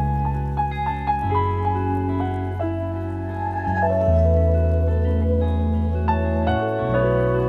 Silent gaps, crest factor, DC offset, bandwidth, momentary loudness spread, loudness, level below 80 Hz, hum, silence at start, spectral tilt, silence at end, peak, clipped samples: none; 12 dB; under 0.1%; 4.5 kHz; 7 LU; -22 LUFS; -32 dBFS; none; 0 s; -10 dB/octave; 0 s; -8 dBFS; under 0.1%